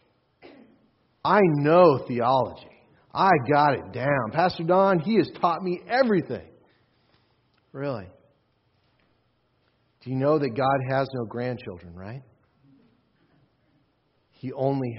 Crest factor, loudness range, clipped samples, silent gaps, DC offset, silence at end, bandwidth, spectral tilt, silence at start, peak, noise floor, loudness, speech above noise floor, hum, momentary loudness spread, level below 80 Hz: 22 dB; 18 LU; under 0.1%; none; under 0.1%; 0 s; 5.8 kHz; -5.5 dB/octave; 1.25 s; -4 dBFS; -69 dBFS; -23 LUFS; 46 dB; none; 18 LU; -64 dBFS